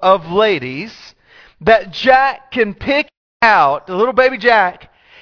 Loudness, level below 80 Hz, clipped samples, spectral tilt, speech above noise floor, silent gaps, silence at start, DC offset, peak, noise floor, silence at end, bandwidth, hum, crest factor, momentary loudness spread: -14 LUFS; -46 dBFS; under 0.1%; -5.5 dB/octave; 33 dB; 3.17-3.40 s; 0 s; under 0.1%; 0 dBFS; -46 dBFS; 0.45 s; 5.4 kHz; none; 14 dB; 9 LU